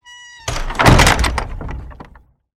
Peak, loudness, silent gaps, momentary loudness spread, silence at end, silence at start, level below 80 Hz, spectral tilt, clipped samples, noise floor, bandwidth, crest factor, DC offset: 0 dBFS; -14 LUFS; none; 20 LU; 0.6 s; 0.1 s; -22 dBFS; -4 dB/octave; 0.2%; -46 dBFS; 17 kHz; 16 dB; under 0.1%